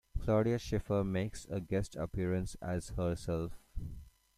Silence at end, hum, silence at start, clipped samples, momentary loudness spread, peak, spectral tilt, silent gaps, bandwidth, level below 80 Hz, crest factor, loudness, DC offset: 0.3 s; none; 0.15 s; under 0.1%; 15 LU; -18 dBFS; -7 dB/octave; none; 14.5 kHz; -48 dBFS; 18 dB; -36 LUFS; under 0.1%